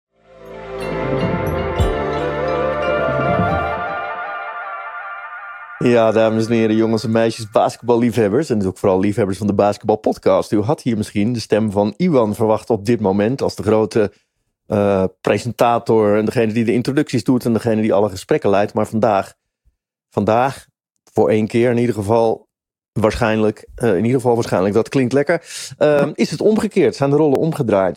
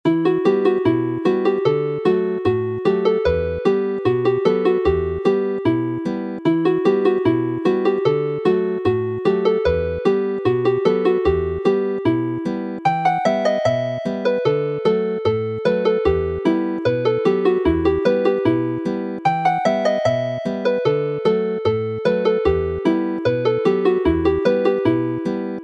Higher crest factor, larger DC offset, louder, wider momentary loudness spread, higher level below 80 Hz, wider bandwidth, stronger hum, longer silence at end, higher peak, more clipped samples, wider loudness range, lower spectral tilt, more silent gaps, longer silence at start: about the same, 16 dB vs 16 dB; neither; about the same, -17 LUFS vs -19 LUFS; first, 9 LU vs 4 LU; about the same, -40 dBFS vs -40 dBFS; first, 15.5 kHz vs 7.8 kHz; neither; about the same, 0 s vs 0 s; about the same, -2 dBFS vs -2 dBFS; neither; about the same, 3 LU vs 1 LU; about the same, -7 dB/octave vs -8 dB/octave; neither; first, 0.4 s vs 0.05 s